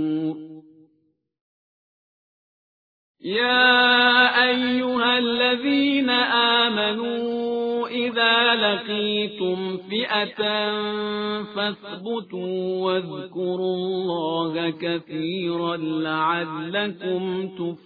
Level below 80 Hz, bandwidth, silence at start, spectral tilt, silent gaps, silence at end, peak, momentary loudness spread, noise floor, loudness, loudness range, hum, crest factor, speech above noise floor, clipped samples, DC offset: -68 dBFS; 5 kHz; 0 s; -6.5 dB/octave; 1.41-3.15 s; 0.1 s; -2 dBFS; 12 LU; -68 dBFS; -21 LUFS; 8 LU; none; 22 dB; 45 dB; under 0.1%; under 0.1%